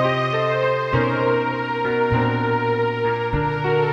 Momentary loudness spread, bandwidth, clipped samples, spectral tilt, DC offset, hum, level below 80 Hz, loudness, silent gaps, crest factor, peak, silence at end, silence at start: 3 LU; 7.2 kHz; under 0.1%; -7.5 dB/octave; under 0.1%; none; -40 dBFS; -21 LUFS; none; 14 dB; -6 dBFS; 0 s; 0 s